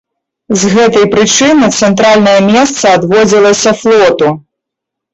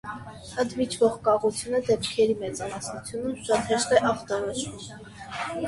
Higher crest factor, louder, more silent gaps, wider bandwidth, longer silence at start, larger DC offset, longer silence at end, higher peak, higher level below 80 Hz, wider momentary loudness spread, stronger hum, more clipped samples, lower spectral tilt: second, 8 dB vs 22 dB; first, -7 LUFS vs -26 LUFS; neither; second, 8.2 kHz vs 11.5 kHz; first, 0.5 s vs 0.05 s; neither; first, 0.75 s vs 0 s; first, 0 dBFS vs -4 dBFS; first, -44 dBFS vs -56 dBFS; second, 6 LU vs 15 LU; neither; neither; about the same, -4 dB/octave vs -4 dB/octave